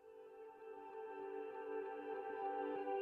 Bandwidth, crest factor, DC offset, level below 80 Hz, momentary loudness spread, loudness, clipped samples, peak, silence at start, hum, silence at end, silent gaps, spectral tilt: 5.2 kHz; 14 dB; under 0.1%; under -90 dBFS; 13 LU; -47 LUFS; under 0.1%; -32 dBFS; 0 s; none; 0 s; none; -6 dB/octave